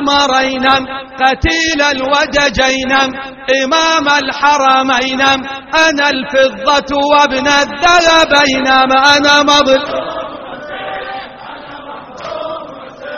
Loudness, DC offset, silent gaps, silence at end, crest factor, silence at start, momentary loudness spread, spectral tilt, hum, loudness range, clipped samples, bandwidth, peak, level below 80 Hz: -10 LUFS; under 0.1%; none; 0 s; 12 dB; 0 s; 18 LU; -2.5 dB/octave; none; 5 LU; under 0.1%; 10.5 kHz; 0 dBFS; -36 dBFS